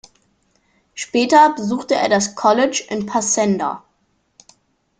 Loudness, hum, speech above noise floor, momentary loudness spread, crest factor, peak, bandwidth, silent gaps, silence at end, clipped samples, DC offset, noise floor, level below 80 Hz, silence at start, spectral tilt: -17 LUFS; none; 48 dB; 13 LU; 18 dB; -2 dBFS; 10 kHz; none; 1.2 s; under 0.1%; under 0.1%; -65 dBFS; -62 dBFS; 0.95 s; -3.5 dB/octave